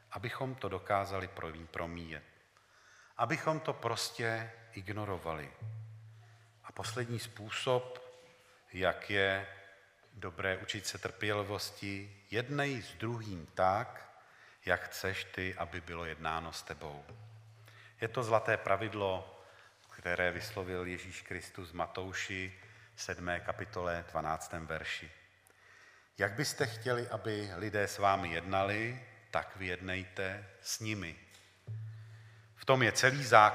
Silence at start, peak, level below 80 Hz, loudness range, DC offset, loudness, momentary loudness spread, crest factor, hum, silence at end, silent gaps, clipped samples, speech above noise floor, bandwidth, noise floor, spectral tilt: 0.1 s; -8 dBFS; -64 dBFS; 5 LU; under 0.1%; -36 LUFS; 17 LU; 30 dB; none; 0 s; none; under 0.1%; 30 dB; 15.5 kHz; -65 dBFS; -4 dB/octave